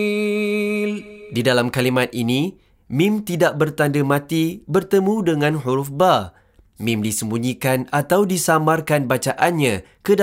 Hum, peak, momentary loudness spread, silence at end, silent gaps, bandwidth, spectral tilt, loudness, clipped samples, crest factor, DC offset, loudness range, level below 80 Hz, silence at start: none; -2 dBFS; 6 LU; 0 s; none; 16 kHz; -5 dB/octave; -19 LUFS; under 0.1%; 16 dB; under 0.1%; 1 LU; -56 dBFS; 0 s